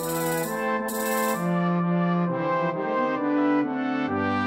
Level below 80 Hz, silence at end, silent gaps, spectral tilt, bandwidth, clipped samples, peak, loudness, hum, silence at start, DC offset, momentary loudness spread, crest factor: -62 dBFS; 0 s; none; -6 dB/octave; 16.5 kHz; under 0.1%; -12 dBFS; -25 LUFS; none; 0 s; under 0.1%; 3 LU; 12 dB